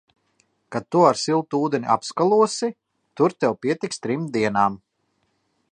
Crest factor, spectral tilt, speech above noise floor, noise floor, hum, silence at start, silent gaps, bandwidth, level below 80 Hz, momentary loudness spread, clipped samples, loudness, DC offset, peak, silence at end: 20 dB; -5 dB/octave; 49 dB; -70 dBFS; none; 0.7 s; none; 10 kHz; -66 dBFS; 9 LU; under 0.1%; -22 LUFS; under 0.1%; -2 dBFS; 0.95 s